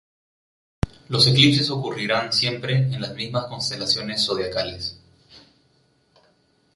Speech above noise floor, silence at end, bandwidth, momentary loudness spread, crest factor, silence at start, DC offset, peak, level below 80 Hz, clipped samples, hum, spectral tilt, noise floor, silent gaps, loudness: 41 dB; 1.35 s; 11.5 kHz; 15 LU; 22 dB; 0.85 s; under 0.1%; -2 dBFS; -46 dBFS; under 0.1%; none; -4.5 dB/octave; -63 dBFS; none; -21 LUFS